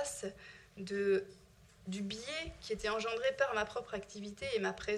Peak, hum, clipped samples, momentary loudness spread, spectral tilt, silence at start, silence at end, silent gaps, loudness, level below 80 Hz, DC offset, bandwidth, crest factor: -18 dBFS; none; under 0.1%; 15 LU; -3.5 dB/octave; 0 s; 0 s; none; -38 LUFS; -62 dBFS; under 0.1%; 13 kHz; 20 dB